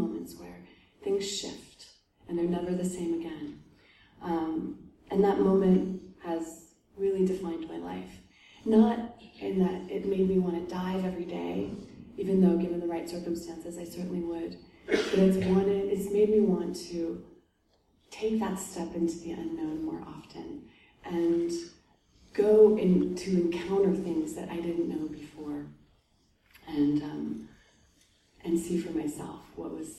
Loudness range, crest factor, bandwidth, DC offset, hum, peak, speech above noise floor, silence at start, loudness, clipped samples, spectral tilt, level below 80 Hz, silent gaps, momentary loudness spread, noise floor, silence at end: 8 LU; 20 dB; 13 kHz; under 0.1%; none; -10 dBFS; 41 dB; 0 s; -29 LUFS; under 0.1%; -7 dB/octave; -58 dBFS; none; 18 LU; -70 dBFS; 0 s